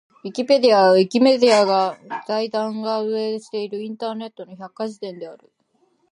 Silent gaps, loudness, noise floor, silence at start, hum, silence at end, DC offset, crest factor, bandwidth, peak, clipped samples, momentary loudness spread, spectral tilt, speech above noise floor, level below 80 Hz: none; -19 LUFS; -64 dBFS; 0.25 s; none; 0.75 s; under 0.1%; 18 dB; 11.5 kHz; -2 dBFS; under 0.1%; 19 LU; -5 dB/octave; 45 dB; -78 dBFS